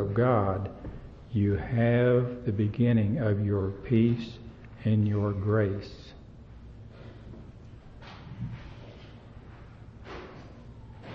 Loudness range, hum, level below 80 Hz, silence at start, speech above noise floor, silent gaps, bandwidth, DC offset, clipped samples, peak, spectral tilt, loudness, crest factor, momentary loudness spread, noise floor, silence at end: 19 LU; none; -50 dBFS; 0 s; 22 dB; none; 5.8 kHz; under 0.1%; under 0.1%; -12 dBFS; -10 dB/octave; -27 LUFS; 18 dB; 24 LU; -48 dBFS; 0 s